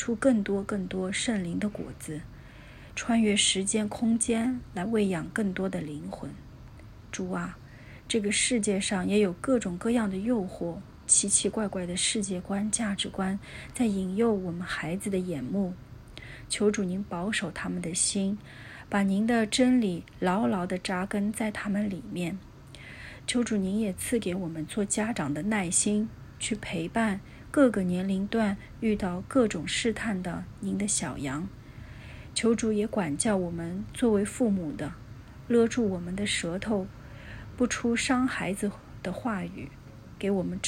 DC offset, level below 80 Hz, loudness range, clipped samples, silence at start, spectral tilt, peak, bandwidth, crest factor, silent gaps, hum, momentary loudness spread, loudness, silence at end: under 0.1%; -52 dBFS; 4 LU; under 0.1%; 0 s; -4 dB/octave; -8 dBFS; 14 kHz; 20 dB; none; none; 17 LU; -28 LUFS; 0 s